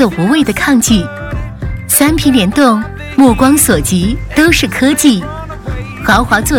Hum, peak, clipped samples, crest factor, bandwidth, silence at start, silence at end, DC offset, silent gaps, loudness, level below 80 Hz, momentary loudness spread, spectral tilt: none; 0 dBFS; 0.2%; 10 dB; 18 kHz; 0 s; 0 s; under 0.1%; none; -10 LUFS; -26 dBFS; 14 LU; -4 dB/octave